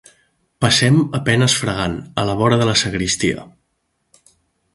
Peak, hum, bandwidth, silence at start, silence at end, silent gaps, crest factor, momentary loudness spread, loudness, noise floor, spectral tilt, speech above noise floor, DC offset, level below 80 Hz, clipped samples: 0 dBFS; none; 11.5 kHz; 0.6 s; 1.3 s; none; 18 dB; 8 LU; -17 LUFS; -69 dBFS; -4 dB/octave; 53 dB; under 0.1%; -44 dBFS; under 0.1%